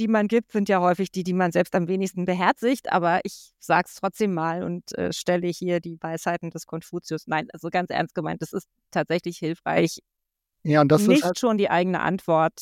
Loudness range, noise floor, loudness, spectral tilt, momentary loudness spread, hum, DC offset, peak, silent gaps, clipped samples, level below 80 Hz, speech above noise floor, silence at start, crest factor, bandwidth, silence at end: 6 LU; -80 dBFS; -24 LUFS; -6 dB/octave; 11 LU; none; under 0.1%; -4 dBFS; none; under 0.1%; -64 dBFS; 57 dB; 0 s; 18 dB; 16.5 kHz; 0 s